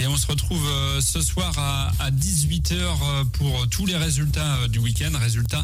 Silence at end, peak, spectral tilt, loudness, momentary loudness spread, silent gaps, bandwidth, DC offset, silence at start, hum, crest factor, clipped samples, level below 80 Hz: 0 s; -10 dBFS; -4 dB/octave; -22 LUFS; 2 LU; none; 16 kHz; under 0.1%; 0 s; none; 12 dB; under 0.1%; -30 dBFS